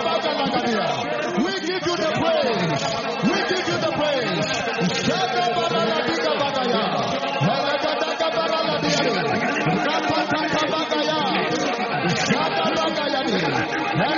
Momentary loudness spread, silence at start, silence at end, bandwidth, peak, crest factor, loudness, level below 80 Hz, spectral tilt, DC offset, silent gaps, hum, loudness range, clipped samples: 3 LU; 0 s; 0 s; 7.2 kHz; -8 dBFS; 14 dB; -21 LUFS; -58 dBFS; -2.5 dB/octave; under 0.1%; none; none; 1 LU; under 0.1%